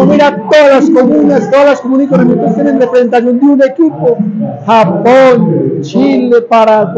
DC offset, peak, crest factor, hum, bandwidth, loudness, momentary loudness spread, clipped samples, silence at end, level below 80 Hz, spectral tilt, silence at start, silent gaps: under 0.1%; 0 dBFS; 6 dB; none; 8 kHz; -7 LUFS; 6 LU; under 0.1%; 0 s; -52 dBFS; -7 dB/octave; 0 s; none